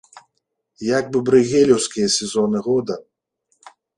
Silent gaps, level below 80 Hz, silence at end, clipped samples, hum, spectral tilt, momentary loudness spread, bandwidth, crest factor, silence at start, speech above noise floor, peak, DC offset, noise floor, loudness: none; -58 dBFS; 0.95 s; under 0.1%; none; -4 dB/octave; 10 LU; 11.5 kHz; 18 dB; 0.15 s; 57 dB; -2 dBFS; under 0.1%; -74 dBFS; -18 LUFS